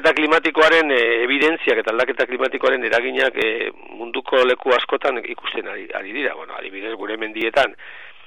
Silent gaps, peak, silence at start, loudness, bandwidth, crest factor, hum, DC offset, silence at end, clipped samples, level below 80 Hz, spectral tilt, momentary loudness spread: none; -4 dBFS; 0 s; -19 LUFS; 11 kHz; 16 dB; none; 0.7%; 0.15 s; under 0.1%; -62 dBFS; -3 dB/octave; 14 LU